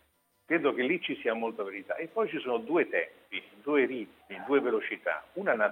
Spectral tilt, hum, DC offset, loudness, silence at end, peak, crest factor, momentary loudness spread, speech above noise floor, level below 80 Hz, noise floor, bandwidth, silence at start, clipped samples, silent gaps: -6.5 dB/octave; none; under 0.1%; -31 LUFS; 0 s; -12 dBFS; 18 dB; 10 LU; 35 dB; -80 dBFS; -66 dBFS; 9.6 kHz; 0.5 s; under 0.1%; none